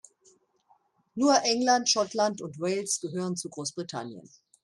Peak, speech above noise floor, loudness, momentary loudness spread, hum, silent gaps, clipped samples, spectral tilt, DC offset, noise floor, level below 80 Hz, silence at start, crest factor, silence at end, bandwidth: -8 dBFS; 39 dB; -27 LUFS; 14 LU; none; none; under 0.1%; -3 dB/octave; under 0.1%; -67 dBFS; -76 dBFS; 1.15 s; 20 dB; 0.45 s; 12.5 kHz